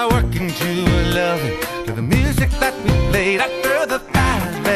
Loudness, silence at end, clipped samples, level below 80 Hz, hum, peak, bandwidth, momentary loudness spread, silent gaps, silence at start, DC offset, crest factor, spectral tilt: -18 LUFS; 0 s; under 0.1%; -26 dBFS; none; -4 dBFS; 14 kHz; 5 LU; none; 0 s; under 0.1%; 14 dB; -5.5 dB/octave